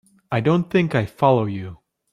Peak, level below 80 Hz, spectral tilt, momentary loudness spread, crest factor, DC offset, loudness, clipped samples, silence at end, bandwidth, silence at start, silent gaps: -2 dBFS; -56 dBFS; -8 dB/octave; 11 LU; 18 dB; under 0.1%; -20 LUFS; under 0.1%; 0.35 s; 11.5 kHz; 0.3 s; none